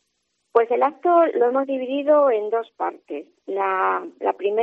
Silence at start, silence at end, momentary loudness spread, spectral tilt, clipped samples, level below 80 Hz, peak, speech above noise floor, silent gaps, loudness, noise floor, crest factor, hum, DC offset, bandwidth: 0.55 s; 0 s; 12 LU; -6.5 dB/octave; under 0.1%; -82 dBFS; -4 dBFS; 52 dB; none; -21 LUFS; -73 dBFS; 16 dB; none; under 0.1%; 4.3 kHz